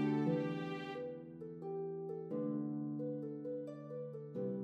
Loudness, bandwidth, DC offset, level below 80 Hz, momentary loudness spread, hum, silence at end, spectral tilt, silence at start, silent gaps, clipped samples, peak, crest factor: -42 LUFS; 7 kHz; under 0.1%; -84 dBFS; 10 LU; none; 0 s; -9 dB/octave; 0 s; none; under 0.1%; -24 dBFS; 16 dB